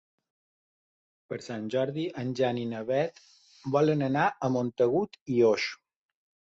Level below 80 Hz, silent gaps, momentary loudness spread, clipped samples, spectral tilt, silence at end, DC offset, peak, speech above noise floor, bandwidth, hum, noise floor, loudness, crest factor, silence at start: -70 dBFS; 5.21-5.26 s; 12 LU; under 0.1%; -6.5 dB/octave; 0.75 s; under 0.1%; -12 dBFS; over 62 dB; 8 kHz; none; under -90 dBFS; -28 LUFS; 18 dB; 1.3 s